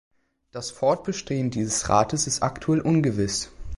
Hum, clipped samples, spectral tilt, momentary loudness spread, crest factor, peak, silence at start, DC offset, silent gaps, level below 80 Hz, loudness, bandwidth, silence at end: none; under 0.1%; -4.5 dB/octave; 8 LU; 20 dB; -4 dBFS; 0.55 s; under 0.1%; none; -46 dBFS; -24 LUFS; 11.5 kHz; 0 s